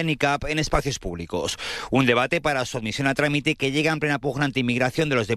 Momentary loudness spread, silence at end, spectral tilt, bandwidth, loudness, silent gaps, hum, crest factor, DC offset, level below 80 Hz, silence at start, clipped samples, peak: 7 LU; 0 s; -5 dB/octave; 14 kHz; -23 LUFS; none; none; 18 dB; under 0.1%; -40 dBFS; 0 s; under 0.1%; -6 dBFS